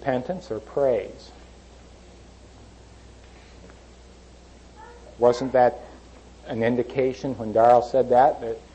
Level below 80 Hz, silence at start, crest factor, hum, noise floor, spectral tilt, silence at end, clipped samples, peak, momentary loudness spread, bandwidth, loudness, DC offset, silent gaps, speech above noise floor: -50 dBFS; 0 s; 18 dB; 60 Hz at -50 dBFS; -48 dBFS; -6.5 dB/octave; 0.15 s; under 0.1%; -6 dBFS; 16 LU; 8.6 kHz; -22 LUFS; under 0.1%; none; 26 dB